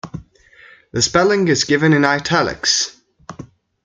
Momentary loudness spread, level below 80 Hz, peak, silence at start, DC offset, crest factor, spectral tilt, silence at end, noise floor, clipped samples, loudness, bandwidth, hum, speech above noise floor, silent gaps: 21 LU; -48 dBFS; 0 dBFS; 0.05 s; under 0.1%; 18 dB; -3.5 dB/octave; 0.4 s; -47 dBFS; under 0.1%; -16 LUFS; 9.6 kHz; none; 32 dB; none